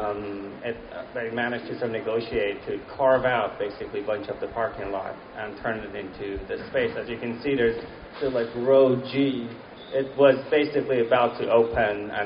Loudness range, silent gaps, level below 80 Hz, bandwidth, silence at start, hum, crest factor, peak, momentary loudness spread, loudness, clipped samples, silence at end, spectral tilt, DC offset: 8 LU; none; -52 dBFS; 5.4 kHz; 0 s; none; 20 dB; -6 dBFS; 14 LU; -25 LUFS; under 0.1%; 0 s; -4 dB/octave; under 0.1%